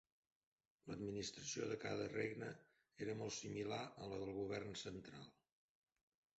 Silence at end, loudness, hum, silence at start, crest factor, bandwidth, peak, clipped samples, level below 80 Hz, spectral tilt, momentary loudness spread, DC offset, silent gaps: 1.1 s; -48 LUFS; none; 0.85 s; 20 dB; 8 kHz; -30 dBFS; under 0.1%; -74 dBFS; -4.5 dB/octave; 11 LU; under 0.1%; none